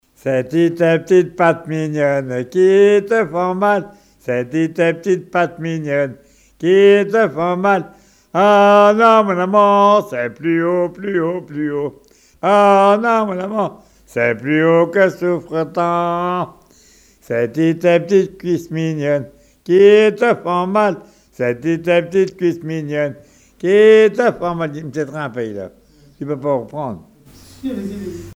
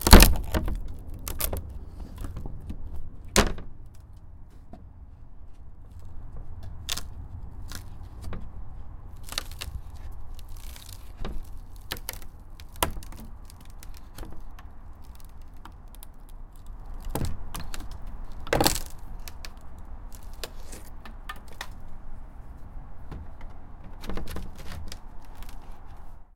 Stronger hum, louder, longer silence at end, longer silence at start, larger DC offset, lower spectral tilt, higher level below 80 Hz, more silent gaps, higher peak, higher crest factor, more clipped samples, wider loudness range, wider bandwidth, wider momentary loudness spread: neither; first, -15 LUFS vs -30 LUFS; about the same, 0 s vs 0.1 s; first, 0.25 s vs 0 s; neither; first, -6.5 dB/octave vs -4 dB/octave; second, -56 dBFS vs -32 dBFS; neither; about the same, 0 dBFS vs 0 dBFS; second, 16 dB vs 28 dB; neither; second, 6 LU vs 12 LU; second, 13 kHz vs 17 kHz; second, 14 LU vs 19 LU